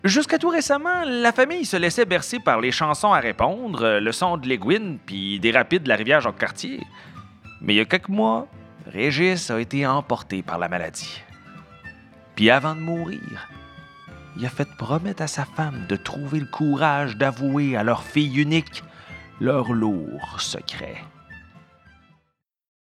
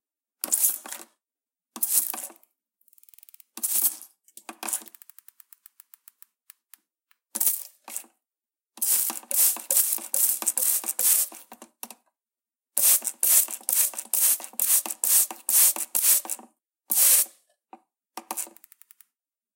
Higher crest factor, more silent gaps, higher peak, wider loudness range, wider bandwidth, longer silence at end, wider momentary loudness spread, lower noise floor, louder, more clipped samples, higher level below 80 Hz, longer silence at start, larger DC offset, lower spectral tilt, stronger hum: about the same, 24 dB vs 26 dB; neither; about the same, 0 dBFS vs 0 dBFS; second, 7 LU vs 12 LU; second, 13.5 kHz vs 17 kHz; first, 1.6 s vs 1.05 s; about the same, 18 LU vs 18 LU; second, -72 dBFS vs under -90 dBFS; about the same, -22 LUFS vs -21 LUFS; neither; first, -54 dBFS vs under -90 dBFS; second, 0.05 s vs 0.45 s; neither; first, -4.5 dB/octave vs 3 dB/octave; neither